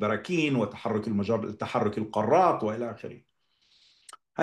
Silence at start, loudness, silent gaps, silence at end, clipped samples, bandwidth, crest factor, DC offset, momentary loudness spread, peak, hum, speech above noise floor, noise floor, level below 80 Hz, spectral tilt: 0 s; -27 LUFS; none; 0 s; under 0.1%; 11.5 kHz; 18 dB; under 0.1%; 14 LU; -10 dBFS; none; 40 dB; -67 dBFS; -72 dBFS; -6.5 dB/octave